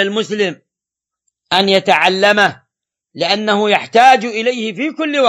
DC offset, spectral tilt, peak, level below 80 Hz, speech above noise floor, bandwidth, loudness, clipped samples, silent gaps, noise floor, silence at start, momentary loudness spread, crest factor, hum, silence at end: under 0.1%; -4 dB/octave; 0 dBFS; -64 dBFS; 71 dB; 15 kHz; -13 LUFS; under 0.1%; none; -85 dBFS; 0 s; 10 LU; 14 dB; none; 0 s